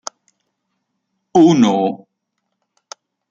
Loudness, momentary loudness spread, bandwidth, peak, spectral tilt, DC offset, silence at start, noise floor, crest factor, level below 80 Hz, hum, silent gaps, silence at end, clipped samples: -14 LUFS; 22 LU; 7.6 kHz; -2 dBFS; -6 dB/octave; under 0.1%; 1.35 s; -74 dBFS; 16 dB; -62 dBFS; none; none; 1.35 s; under 0.1%